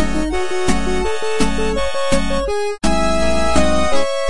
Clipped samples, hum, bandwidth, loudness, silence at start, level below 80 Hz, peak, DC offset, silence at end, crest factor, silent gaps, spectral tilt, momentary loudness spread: under 0.1%; none; 11.5 kHz; -19 LUFS; 0 s; -26 dBFS; 0 dBFS; 10%; 0 s; 16 dB; none; -4.5 dB/octave; 4 LU